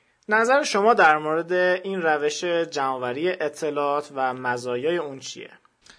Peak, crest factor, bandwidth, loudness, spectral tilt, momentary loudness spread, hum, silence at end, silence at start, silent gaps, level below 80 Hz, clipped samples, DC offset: -4 dBFS; 20 dB; 11 kHz; -22 LUFS; -3.5 dB/octave; 10 LU; none; 0.5 s; 0.3 s; none; -72 dBFS; under 0.1%; under 0.1%